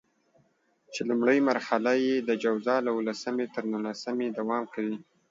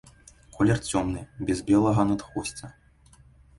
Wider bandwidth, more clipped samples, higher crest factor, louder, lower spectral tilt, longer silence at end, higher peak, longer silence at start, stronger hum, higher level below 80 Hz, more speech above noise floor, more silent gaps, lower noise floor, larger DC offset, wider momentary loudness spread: second, 7.8 kHz vs 11.5 kHz; neither; about the same, 18 dB vs 18 dB; about the same, -28 LUFS vs -26 LUFS; about the same, -5 dB/octave vs -6 dB/octave; second, 0.3 s vs 0.85 s; about the same, -10 dBFS vs -10 dBFS; first, 0.9 s vs 0.55 s; neither; second, -80 dBFS vs -48 dBFS; first, 41 dB vs 31 dB; neither; first, -68 dBFS vs -56 dBFS; neither; second, 9 LU vs 13 LU